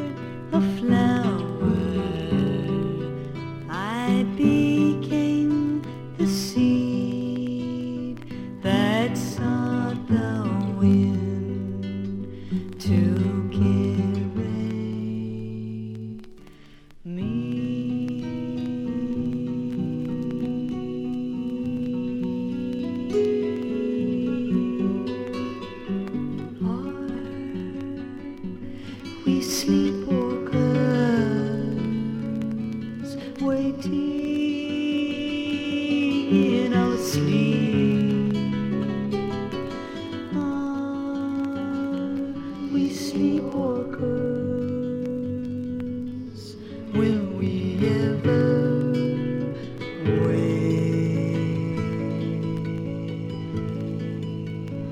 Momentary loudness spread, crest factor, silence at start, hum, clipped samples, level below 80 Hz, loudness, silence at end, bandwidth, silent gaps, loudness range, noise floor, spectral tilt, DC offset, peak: 11 LU; 18 dB; 0 s; none; under 0.1%; -52 dBFS; -25 LUFS; 0 s; 16 kHz; none; 6 LU; -47 dBFS; -7 dB/octave; under 0.1%; -6 dBFS